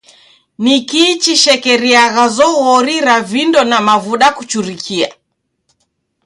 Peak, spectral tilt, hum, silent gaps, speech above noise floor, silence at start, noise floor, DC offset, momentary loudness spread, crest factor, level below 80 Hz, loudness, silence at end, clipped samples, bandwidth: 0 dBFS; -2 dB/octave; none; none; 57 dB; 0.6 s; -68 dBFS; under 0.1%; 9 LU; 12 dB; -58 dBFS; -11 LUFS; 1.15 s; under 0.1%; 16 kHz